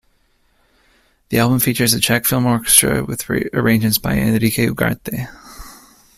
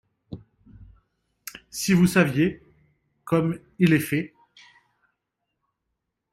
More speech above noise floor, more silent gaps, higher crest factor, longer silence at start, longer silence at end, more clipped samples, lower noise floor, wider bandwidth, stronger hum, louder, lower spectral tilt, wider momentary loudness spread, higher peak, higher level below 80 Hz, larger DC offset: second, 43 dB vs 59 dB; neither; about the same, 18 dB vs 20 dB; first, 1.3 s vs 0.3 s; second, 0.45 s vs 2.05 s; neither; second, -59 dBFS vs -80 dBFS; about the same, 16 kHz vs 16 kHz; neither; first, -16 LUFS vs -23 LUFS; second, -4 dB/octave vs -6 dB/octave; second, 12 LU vs 24 LU; first, 0 dBFS vs -6 dBFS; first, -40 dBFS vs -56 dBFS; neither